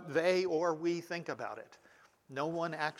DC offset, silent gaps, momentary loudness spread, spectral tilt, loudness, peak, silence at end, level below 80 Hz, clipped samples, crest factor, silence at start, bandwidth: under 0.1%; none; 13 LU; -5.5 dB/octave; -35 LUFS; -18 dBFS; 0 s; -82 dBFS; under 0.1%; 18 dB; 0 s; 14 kHz